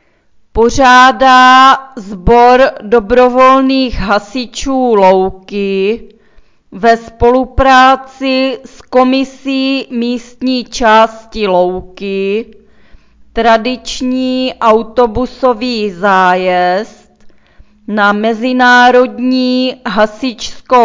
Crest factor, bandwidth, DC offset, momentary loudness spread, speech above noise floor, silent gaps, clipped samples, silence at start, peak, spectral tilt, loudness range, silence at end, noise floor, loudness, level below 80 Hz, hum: 10 dB; 8 kHz; under 0.1%; 12 LU; 39 dB; none; 0.8%; 0.55 s; 0 dBFS; -4.5 dB/octave; 6 LU; 0 s; -49 dBFS; -10 LUFS; -30 dBFS; none